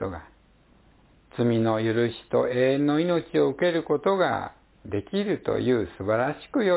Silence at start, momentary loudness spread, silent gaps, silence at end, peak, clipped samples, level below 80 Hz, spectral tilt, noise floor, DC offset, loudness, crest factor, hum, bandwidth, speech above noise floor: 0 s; 10 LU; none; 0 s; -10 dBFS; under 0.1%; -54 dBFS; -11 dB/octave; -58 dBFS; under 0.1%; -25 LUFS; 16 dB; none; 4 kHz; 34 dB